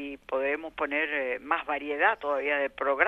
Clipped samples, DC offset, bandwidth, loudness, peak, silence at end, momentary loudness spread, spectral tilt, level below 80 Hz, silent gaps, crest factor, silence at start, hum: under 0.1%; under 0.1%; 5.8 kHz; -28 LUFS; -6 dBFS; 0 s; 6 LU; -4.5 dB/octave; -62 dBFS; none; 22 dB; 0 s; none